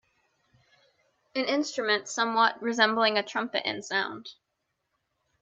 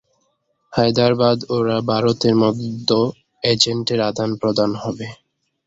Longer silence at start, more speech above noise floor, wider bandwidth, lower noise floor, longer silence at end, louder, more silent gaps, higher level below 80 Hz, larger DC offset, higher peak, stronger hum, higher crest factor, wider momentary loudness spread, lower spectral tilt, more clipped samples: first, 1.35 s vs 0.7 s; first, 53 dB vs 49 dB; first, 8.6 kHz vs 7.8 kHz; first, -80 dBFS vs -67 dBFS; first, 1.1 s vs 0.5 s; second, -27 LUFS vs -18 LUFS; neither; second, -80 dBFS vs -54 dBFS; neither; second, -6 dBFS vs 0 dBFS; neither; first, 24 dB vs 18 dB; about the same, 11 LU vs 9 LU; second, -2.5 dB/octave vs -5.5 dB/octave; neither